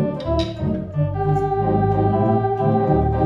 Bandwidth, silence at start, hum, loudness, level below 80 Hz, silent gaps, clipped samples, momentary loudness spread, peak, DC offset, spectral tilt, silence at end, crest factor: 7.2 kHz; 0 s; none; -20 LUFS; -32 dBFS; none; under 0.1%; 5 LU; -6 dBFS; 0.1%; -9.5 dB/octave; 0 s; 14 dB